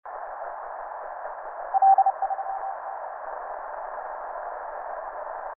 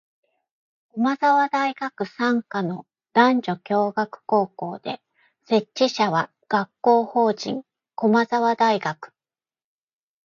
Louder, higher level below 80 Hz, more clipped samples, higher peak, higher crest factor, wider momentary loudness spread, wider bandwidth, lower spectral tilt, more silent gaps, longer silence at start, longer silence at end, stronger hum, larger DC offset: second, -28 LUFS vs -22 LUFS; first, -62 dBFS vs -74 dBFS; neither; second, -10 dBFS vs -4 dBFS; about the same, 18 dB vs 20 dB; first, 16 LU vs 13 LU; second, 2.5 kHz vs 7.4 kHz; second, -2.5 dB/octave vs -5.5 dB/octave; neither; second, 0.05 s vs 0.95 s; second, 0.05 s vs 1.2 s; neither; neither